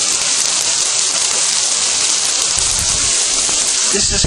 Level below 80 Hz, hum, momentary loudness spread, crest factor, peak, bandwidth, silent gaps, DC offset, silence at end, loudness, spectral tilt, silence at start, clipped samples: -38 dBFS; none; 1 LU; 16 dB; 0 dBFS; over 20 kHz; none; under 0.1%; 0 s; -12 LUFS; 0.5 dB/octave; 0 s; under 0.1%